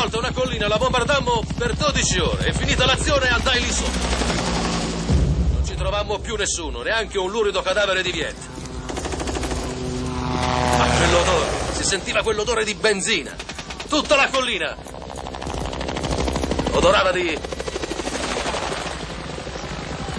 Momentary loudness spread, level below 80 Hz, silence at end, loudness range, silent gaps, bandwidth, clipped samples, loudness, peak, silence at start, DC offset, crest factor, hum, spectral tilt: 13 LU; -30 dBFS; 0 s; 4 LU; none; 11 kHz; under 0.1%; -21 LUFS; -4 dBFS; 0 s; under 0.1%; 18 dB; none; -3.5 dB/octave